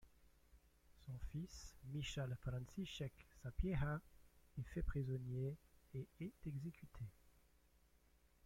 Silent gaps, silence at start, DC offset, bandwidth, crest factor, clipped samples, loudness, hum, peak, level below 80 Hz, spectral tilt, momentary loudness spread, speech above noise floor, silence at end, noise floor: none; 0 s; under 0.1%; 16.5 kHz; 20 dB; under 0.1%; -49 LUFS; 60 Hz at -75 dBFS; -28 dBFS; -56 dBFS; -6.5 dB/octave; 12 LU; 27 dB; 1.15 s; -74 dBFS